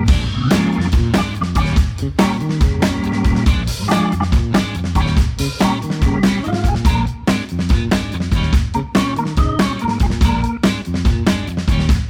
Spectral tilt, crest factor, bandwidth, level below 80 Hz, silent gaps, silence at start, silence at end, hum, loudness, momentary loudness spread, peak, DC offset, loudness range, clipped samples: -6 dB/octave; 14 dB; 16 kHz; -20 dBFS; none; 0 s; 0 s; none; -17 LUFS; 3 LU; -2 dBFS; under 0.1%; 1 LU; under 0.1%